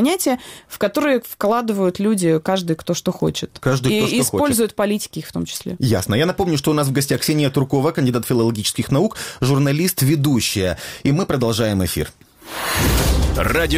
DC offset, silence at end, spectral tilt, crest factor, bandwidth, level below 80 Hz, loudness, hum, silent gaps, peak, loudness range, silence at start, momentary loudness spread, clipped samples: under 0.1%; 0 s; -5 dB/octave; 14 dB; 16.5 kHz; -32 dBFS; -19 LUFS; none; none; -4 dBFS; 1 LU; 0 s; 6 LU; under 0.1%